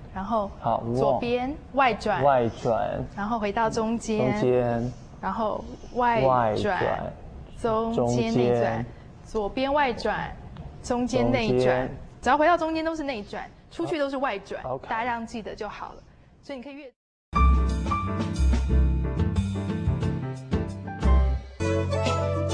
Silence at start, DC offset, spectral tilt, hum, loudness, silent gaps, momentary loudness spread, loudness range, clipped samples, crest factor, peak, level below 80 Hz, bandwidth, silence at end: 0 s; under 0.1%; -6.5 dB/octave; none; -26 LUFS; 16.96-17.32 s; 13 LU; 5 LU; under 0.1%; 18 dB; -8 dBFS; -32 dBFS; 10 kHz; 0 s